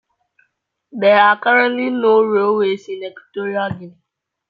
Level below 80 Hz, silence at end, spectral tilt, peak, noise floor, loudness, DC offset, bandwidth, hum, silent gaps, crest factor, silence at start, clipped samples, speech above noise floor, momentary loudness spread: -64 dBFS; 0.6 s; -6.5 dB/octave; -2 dBFS; -67 dBFS; -15 LUFS; under 0.1%; 7 kHz; none; none; 16 dB; 0.95 s; under 0.1%; 51 dB; 17 LU